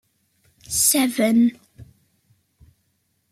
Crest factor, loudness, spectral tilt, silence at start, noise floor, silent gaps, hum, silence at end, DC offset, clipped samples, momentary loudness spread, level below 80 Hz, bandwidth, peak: 20 dB; -18 LUFS; -2.5 dB/octave; 0.7 s; -69 dBFS; none; none; 1.5 s; under 0.1%; under 0.1%; 5 LU; -58 dBFS; 16 kHz; -4 dBFS